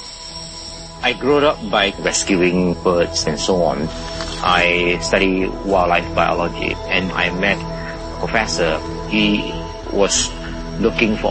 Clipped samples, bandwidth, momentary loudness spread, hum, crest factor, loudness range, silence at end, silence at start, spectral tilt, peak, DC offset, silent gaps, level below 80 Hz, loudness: under 0.1%; 8.8 kHz; 12 LU; none; 18 dB; 2 LU; 0 s; 0 s; -3.5 dB/octave; 0 dBFS; under 0.1%; none; -34 dBFS; -18 LUFS